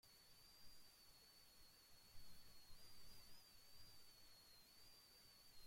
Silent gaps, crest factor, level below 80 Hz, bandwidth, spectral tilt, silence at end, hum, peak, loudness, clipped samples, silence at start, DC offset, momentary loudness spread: none; 14 dB; -76 dBFS; 16.5 kHz; -1.5 dB/octave; 0 s; none; -48 dBFS; -67 LUFS; under 0.1%; 0.05 s; under 0.1%; 2 LU